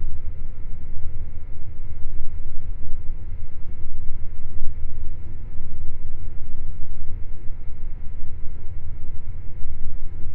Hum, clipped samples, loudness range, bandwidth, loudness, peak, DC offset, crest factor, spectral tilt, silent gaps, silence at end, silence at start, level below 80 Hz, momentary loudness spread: none; under 0.1%; 1 LU; 0.6 kHz; -37 LUFS; -2 dBFS; under 0.1%; 12 dB; -10.5 dB/octave; none; 0 s; 0 s; -26 dBFS; 3 LU